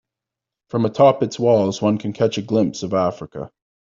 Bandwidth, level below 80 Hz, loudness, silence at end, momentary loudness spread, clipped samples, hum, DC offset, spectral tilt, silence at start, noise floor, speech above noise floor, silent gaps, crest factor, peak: 7.6 kHz; -58 dBFS; -19 LUFS; 0.45 s; 17 LU; under 0.1%; none; under 0.1%; -6.5 dB/octave; 0.75 s; -86 dBFS; 67 dB; none; 16 dB; -2 dBFS